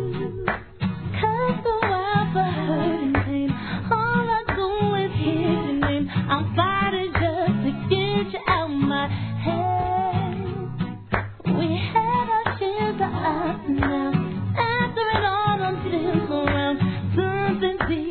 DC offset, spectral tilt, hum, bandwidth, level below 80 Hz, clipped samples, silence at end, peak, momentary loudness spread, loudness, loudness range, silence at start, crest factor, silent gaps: 0.2%; -10 dB/octave; none; 4.5 kHz; -42 dBFS; under 0.1%; 0 s; -6 dBFS; 5 LU; -23 LUFS; 2 LU; 0 s; 18 dB; none